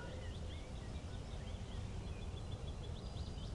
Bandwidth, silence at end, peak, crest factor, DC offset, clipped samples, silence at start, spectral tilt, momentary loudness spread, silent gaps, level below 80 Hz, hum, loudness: 11.5 kHz; 0 s; -34 dBFS; 12 dB; under 0.1%; under 0.1%; 0 s; -6 dB/octave; 1 LU; none; -50 dBFS; none; -48 LUFS